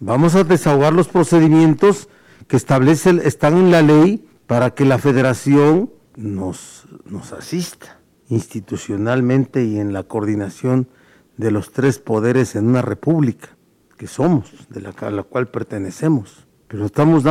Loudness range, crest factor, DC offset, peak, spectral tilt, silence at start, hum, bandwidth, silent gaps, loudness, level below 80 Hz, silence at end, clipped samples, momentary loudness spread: 9 LU; 10 dB; under 0.1%; -6 dBFS; -7 dB/octave; 0 s; none; 15 kHz; none; -16 LUFS; -50 dBFS; 0 s; under 0.1%; 16 LU